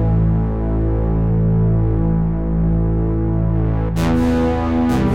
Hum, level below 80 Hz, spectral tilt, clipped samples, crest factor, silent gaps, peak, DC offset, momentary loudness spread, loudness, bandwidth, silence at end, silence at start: none; -22 dBFS; -9 dB/octave; under 0.1%; 10 dB; none; -6 dBFS; 2%; 3 LU; -18 LUFS; 9.8 kHz; 0 s; 0 s